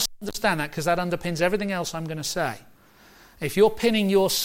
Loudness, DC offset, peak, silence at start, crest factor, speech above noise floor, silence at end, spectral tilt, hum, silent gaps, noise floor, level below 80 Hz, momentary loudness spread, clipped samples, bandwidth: -24 LUFS; under 0.1%; -8 dBFS; 0 s; 16 dB; 29 dB; 0 s; -4 dB/octave; none; none; -53 dBFS; -50 dBFS; 10 LU; under 0.1%; 16.5 kHz